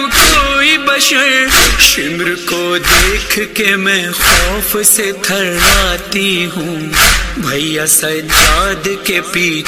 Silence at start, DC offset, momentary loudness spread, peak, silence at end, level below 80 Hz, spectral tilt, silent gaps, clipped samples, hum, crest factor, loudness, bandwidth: 0 s; under 0.1%; 8 LU; 0 dBFS; 0 s; -24 dBFS; -1.5 dB/octave; none; 0.6%; none; 12 dB; -10 LUFS; over 20 kHz